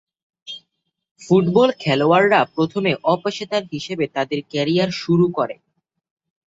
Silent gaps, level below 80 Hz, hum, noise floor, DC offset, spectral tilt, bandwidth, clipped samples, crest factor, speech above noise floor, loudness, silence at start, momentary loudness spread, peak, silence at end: 1.11-1.15 s; -60 dBFS; none; -73 dBFS; under 0.1%; -6.5 dB/octave; 7.8 kHz; under 0.1%; 18 dB; 54 dB; -19 LUFS; 0.45 s; 14 LU; -2 dBFS; 0.95 s